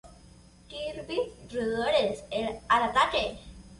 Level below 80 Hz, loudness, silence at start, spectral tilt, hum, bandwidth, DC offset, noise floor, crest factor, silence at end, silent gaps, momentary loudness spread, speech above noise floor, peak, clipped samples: -52 dBFS; -28 LUFS; 0.05 s; -4 dB/octave; none; 11.5 kHz; under 0.1%; -54 dBFS; 20 dB; 0.05 s; none; 13 LU; 26 dB; -10 dBFS; under 0.1%